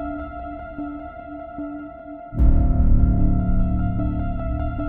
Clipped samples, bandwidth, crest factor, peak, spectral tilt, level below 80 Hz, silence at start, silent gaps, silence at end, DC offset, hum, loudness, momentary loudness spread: under 0.1%; 3.3 kHz; 16 dB; -4 dBFS; -12.5 dB/octave; -22 dBFS; 0 s; none; 0 s; under 0.1%; none; -23 LUFS; 16 LU